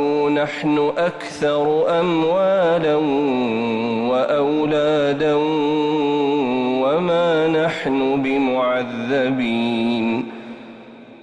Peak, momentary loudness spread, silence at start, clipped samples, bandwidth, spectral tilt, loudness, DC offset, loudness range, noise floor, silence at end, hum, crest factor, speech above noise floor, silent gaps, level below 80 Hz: -8 dBFS; 5 LU; 0 s; under 0.1%; 10 kHz; -6.5 dB/octave; -19 LUFS; under 0.1%; 1 LU; -40 dBFS; 0.05 s; none; 10 dB; 22 dB; none; -58 dBFS